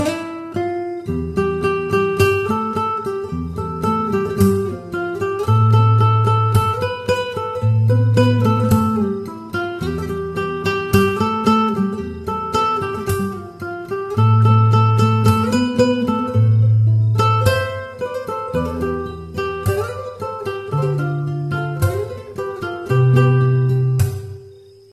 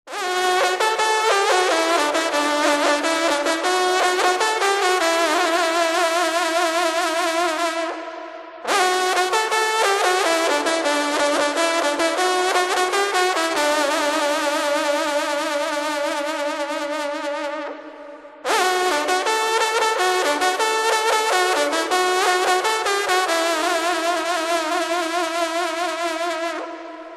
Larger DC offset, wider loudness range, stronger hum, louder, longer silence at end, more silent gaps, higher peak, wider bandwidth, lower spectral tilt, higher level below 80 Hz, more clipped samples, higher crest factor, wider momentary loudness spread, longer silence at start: neither; first, 7 LU vs 4 LU; neither; about the same, -18 LUFS vs -19 LUFS; first, 0.35 s vs 0 s; neither; about the same, -2 dBFS vs -2 dBFS; about the same, 14 kHz vs 13 kHz; first, -7.5 dB/octave vs 0 dB/octave; first, -42 dBFS vs -68 dBFS; neither; about the same, 16 dB vs 18 dB; first, 12 LU vs 7 LU; about the same, 0 s vs 0.05 s